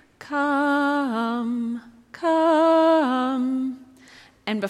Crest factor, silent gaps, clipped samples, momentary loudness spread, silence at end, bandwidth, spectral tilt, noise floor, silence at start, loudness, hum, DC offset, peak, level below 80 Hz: 14 dB; none; under 0.1%; 13 LU; 0 s; 12 kHz; -5.5 dB/octave; -50 dBFS; 0.2 s; -22 LUFS; none; under 0.1%; -10 dBFS; -70 dBFS